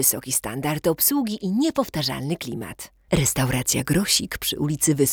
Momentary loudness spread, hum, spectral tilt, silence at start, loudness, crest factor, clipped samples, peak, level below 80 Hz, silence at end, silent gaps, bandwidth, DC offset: 9 LU; none; -3.5 dB/octave; 0 s; -22 LUFS; 18 dB; under 0.1%; -6 dBFS; -46 dBFS; 0 s; none; over 20 kHz; under 0.1%